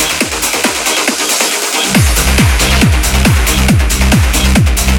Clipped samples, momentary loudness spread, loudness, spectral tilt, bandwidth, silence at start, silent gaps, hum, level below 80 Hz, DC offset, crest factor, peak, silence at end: under 0.1%; 2 LU; -10 LUFS; -3.5 dB/octave; 19 kHz; 0 s; none; none; -14 dBFS; under 0.1%; 10 dB; 0 dBFS; 0 s